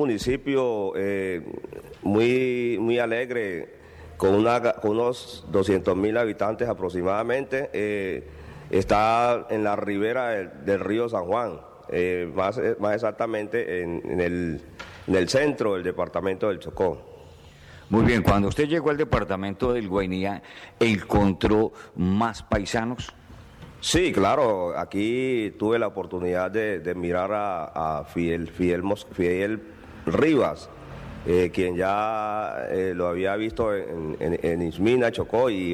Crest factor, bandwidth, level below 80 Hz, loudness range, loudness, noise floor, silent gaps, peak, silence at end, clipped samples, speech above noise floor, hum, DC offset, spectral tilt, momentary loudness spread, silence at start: 18 dB; 15.5 kHz; -46 dBFS; 2 LU; -25 LUFS; -47 dBFS; none; -8 dBFS; 0 s; under 0.1%; 23 dB; none; under 0.1%; -6 dB/octave; 10 LU; 0 s